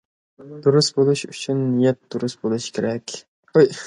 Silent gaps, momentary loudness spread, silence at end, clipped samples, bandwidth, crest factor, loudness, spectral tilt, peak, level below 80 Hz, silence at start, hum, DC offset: 3.28-3.43 s; 12 LU; 0 s; under 0.1%; 11 kHz; 18 dB; -21 LUFS; -5.5 dB/octave; -2 dBFS; -64 dBFS; 0.4 s; none; under 0.1%